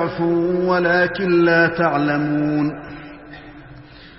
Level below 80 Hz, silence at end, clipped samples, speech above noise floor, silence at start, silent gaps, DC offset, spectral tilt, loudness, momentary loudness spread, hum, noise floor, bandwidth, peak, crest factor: -50 dBFS; 0.1 s; under 0.1%; 24 dB; 0 s; none; 0.1%; -10.5 dB/octave; -18 LUFS; 22 LU; none; -41 dBFS; 5.8 kHz; -4 dBFS; 16 dB